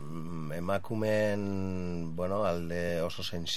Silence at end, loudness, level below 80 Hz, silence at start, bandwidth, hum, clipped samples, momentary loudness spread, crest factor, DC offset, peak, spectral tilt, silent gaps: 0 s; -33 LUFS; -58 dBFS; 0 s; 15.5 kHz; none; under 0.1%; 8 LU; 16 dB; 1%; -16 dBFS; -5.5 dB/octave; none